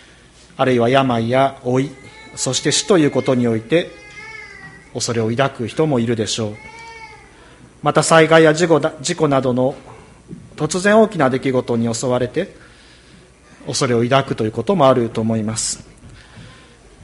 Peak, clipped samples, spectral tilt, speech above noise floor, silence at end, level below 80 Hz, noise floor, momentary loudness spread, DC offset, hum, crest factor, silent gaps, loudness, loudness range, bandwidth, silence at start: 0 dBFS; under 0.1%; -4.5 dB/octave; 30 dB; 0.55 s; -50 dBFS; -46 dBFS; 20 LU; under 0.1%; none; 18 dB; none; -17 LUFS; 5 LU; 11.5 kHz; 0.6 s